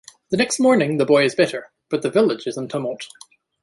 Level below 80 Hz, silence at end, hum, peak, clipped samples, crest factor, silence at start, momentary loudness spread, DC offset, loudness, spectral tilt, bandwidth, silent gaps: -62 dBFS; 0.55 s; none; -4 dBFS; under 0.1%; 16 dB; 0.3 s; 13 LU; under 0.1%; -19 LUFS; -4.5 dB/octave; 11.5 kHz; none